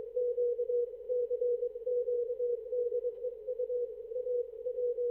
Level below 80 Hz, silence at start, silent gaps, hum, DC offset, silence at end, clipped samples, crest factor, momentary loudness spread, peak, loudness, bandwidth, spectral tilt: -72 dBFS; 0 s; none; none; under 0.1%; 0 s; under 0.1%; 10 dB; 6 LU; -24 dBFS; -35 LUFS; 1 kHz; -8 dB/octave